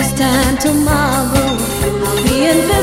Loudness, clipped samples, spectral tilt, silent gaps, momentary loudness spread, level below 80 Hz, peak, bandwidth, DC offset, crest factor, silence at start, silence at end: -14 LUFS; under 0.1%; -4.5 dB/octave; none; 4 LU; -26 dBFS; 0 dBFS; 16.5 kHz; under 0.1%; 14 dB; 0 s; 0 s